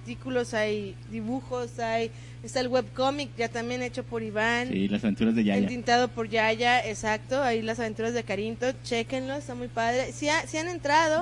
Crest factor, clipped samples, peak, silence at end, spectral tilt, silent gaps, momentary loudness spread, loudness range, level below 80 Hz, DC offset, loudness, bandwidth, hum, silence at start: 16 dB; under 0.1%; -10 dBFS; 0 s; -4.5 dB/octave; none; 9 LU; 5 LU; -52 dBFS; under 0.1%; -28 LUFS; 11.5 kHz; none; 0 s